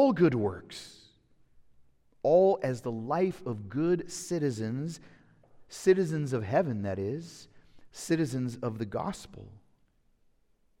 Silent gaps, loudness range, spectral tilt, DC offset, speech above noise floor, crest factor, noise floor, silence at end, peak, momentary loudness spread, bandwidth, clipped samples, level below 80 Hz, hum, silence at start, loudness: none; 6 LU; -6.5 dB/octave; under 0.1%; 38 dB; 20 dB; -68 dBFS; 1.25 s; -12 dBFS; 19 LU; 15.5 kHz; under 0.1%; -64 dBFS; none; 0 s; -30 LUFS